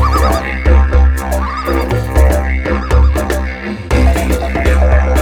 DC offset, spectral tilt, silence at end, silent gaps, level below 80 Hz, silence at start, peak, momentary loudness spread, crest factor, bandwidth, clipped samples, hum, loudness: under 0.1%; -6.5 dB/octave; 0 s; none; -12 dBFS; 0 s; 0 dBFS; 6 LU; 12 dB; 15 kHz; under 0.1%; none; -13 LUFS